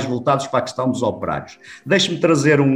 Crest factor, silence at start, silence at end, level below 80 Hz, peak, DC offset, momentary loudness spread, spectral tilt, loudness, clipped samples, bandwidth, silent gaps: 16 dB; 0 s; 0 s; -56 dBFS; -4 dBFS; under 0.1%; 13 LU; -5 dB/octave; -19 LUFS; under 0.1%; 12 kHz; none